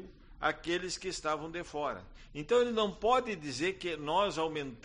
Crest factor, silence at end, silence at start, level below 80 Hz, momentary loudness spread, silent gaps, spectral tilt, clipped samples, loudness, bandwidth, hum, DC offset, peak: 18 dB; 0.05 s; 0 s; -56 dBFS; 9 LU; none; -4 dB/octave; under 0.1%; -33 LUFS; 10 kHz; none; under 0.1%; -16 dBFS